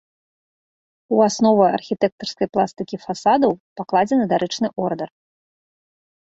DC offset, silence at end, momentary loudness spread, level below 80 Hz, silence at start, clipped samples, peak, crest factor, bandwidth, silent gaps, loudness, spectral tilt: under 0.1%; 1.15 s; 12 LU; -62 dBFS; 1.1 s; under 0.1%; -2 dBFS; 18 dB; 8 kHz; 2.12-2.18 s, 3.60-3.76 s; -20 LUFS; -5.5 dB/octave